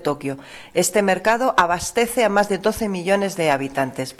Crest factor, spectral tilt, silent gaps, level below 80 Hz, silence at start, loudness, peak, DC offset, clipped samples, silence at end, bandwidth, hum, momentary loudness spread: 16 dB; -4 dB/octave; none; -50 dBFS; 0 s; -20 LUFS; -6 dBFS; under 0.1%; under 0.1%; 0.05 s; 15.5 kHz; none; 8 LU